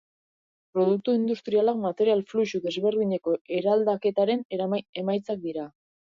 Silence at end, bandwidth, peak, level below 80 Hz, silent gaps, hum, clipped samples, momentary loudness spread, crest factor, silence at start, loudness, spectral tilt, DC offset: 0.45 s; 7.2 kHz; -12 dBFS; -74 dBFS; 3.41-3.45 s, 4.45-4.50 s, 4.89-4.93 s; none; under 0.1%; 8 LU; 14 dB; 0.75 s; -26 LUFS; -7 dB/octave; under 0.1%